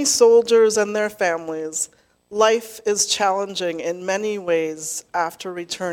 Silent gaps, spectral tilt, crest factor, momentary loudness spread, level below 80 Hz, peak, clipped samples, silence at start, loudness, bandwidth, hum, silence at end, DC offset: none; -2 dB/octave; 18 dB; 13 LU; -66 dBFS; -2 dBFS; under 0.1%; 0 s; -20 LUFS; 16.5 kHz; none; 0 s; under 0.1%